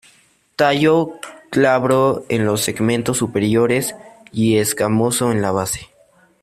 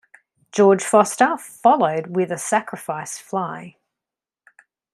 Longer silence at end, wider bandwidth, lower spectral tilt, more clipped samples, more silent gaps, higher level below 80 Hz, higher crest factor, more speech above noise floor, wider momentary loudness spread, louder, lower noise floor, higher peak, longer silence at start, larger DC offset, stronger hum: second, 0.55 s vs 1.25 s; first, 16 kHz vs 13.5 kHz; about the same, -5 dB/octave vs -4.5 dB/octave; neither; neither; first, -52 dBFS vs -72 dBFS; about the same, 16 dB vs 18 dB; second, 38 dB vs 69 dB; second, 10 LU vs 13 LU; about the same, -17 LUFS vs -19 LUFS; second, -54 dBFS vs -88 dBFS; about the same, -2 dBFS vs -2 dBFS; about the same, 0.6 s vs 0.55 s; neither; neither